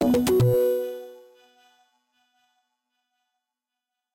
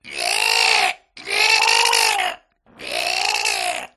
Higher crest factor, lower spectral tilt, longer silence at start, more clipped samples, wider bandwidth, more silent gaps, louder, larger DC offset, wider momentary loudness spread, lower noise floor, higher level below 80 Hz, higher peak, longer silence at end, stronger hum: about the same, 16 dB vs 20 dB; first, -7 dB/octave vs 2 dB/octave; about the same, 0 s vs 0.05 s; neither; first, 17 kHz vs 13.5 kHz; neither; second, -22 LUFS vs -17 LUFS; neither; first, 20 LU vs 12 LU; first, -86 dBFS vs -44 dBFS; about the same, -54 dBFS vs -58 dBFS; second, -12 dBFS vs 0 dBFS; first, 3 s vs 0.1 s; neither